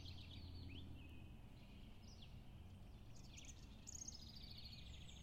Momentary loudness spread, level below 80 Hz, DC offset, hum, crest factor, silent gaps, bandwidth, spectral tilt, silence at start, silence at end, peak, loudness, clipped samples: 8 LU; -62 dBFS; under 0.1%; none; 16 dB; none; 16 kHz; -3.5 dB/octave; 0 s; 0 s; -40 dBFS; -58 LUFS; under 0.1%